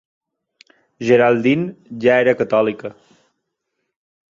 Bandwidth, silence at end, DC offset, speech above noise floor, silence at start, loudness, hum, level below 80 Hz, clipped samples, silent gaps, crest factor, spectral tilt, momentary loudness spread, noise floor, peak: 7.4 kHz; 1.4 s; under 0.1%; 59 dB; 1 s; -16 LUFS; none; -62 dBFS; under 0.1%; none; 18 dB; -7 dB/octave; 14 LU; -75 dBFS; -2 dBFS